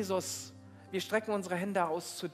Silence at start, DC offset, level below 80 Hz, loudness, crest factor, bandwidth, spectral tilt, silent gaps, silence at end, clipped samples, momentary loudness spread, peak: 0 s; under 0.1%; -88 dBFS; -35 LUFS; 18 dB; 16 kHz; -4 dB/octave; none; 0 s; under 0.1%; 10 LU; -16 dBFS